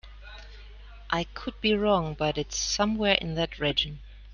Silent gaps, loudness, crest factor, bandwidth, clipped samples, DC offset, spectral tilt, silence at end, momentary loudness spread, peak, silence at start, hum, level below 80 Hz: none; -27 LUFS; 24 dB; 10.5 kHz; under 0.1%; under 0.1%; -3.5 dB/octave; 0 s; 22 LU; -6 dBFS; 0.05 s; none; -44 dBFS